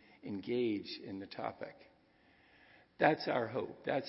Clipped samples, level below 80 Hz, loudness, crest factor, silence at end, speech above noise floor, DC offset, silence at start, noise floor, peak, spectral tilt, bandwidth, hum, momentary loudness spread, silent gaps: under 0.1%; -78 dBFS; -37 LUFS; 26 dB; 0 s; 31 dB; under 0.1%; 0.25 s; -68 dBFS; -12 dBFS; -4 dB/octave; 5.8 kHz; none; 14 LU; none